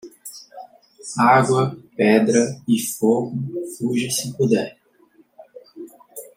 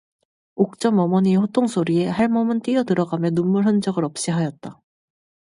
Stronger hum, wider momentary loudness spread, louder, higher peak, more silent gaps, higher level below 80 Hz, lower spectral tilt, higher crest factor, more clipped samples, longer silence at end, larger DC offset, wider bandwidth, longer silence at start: neither; first, 23 LU vs 6 LU; about the same, -19 LUFS vs -20 LUFS; about the same, -2 dBFS vs -4 dBFS; neither; about the same, -64 dBFS vs -62 dBFS; second, -5 dB/octave vs -6.5 dB/octave; about the same, 18 dB vs 16 dB; neither; second, 0.15 s vs 0.85 s; neither; first, 16.5 kHz vs 11.5 kHz; second, 0.05 s vs 0.55 s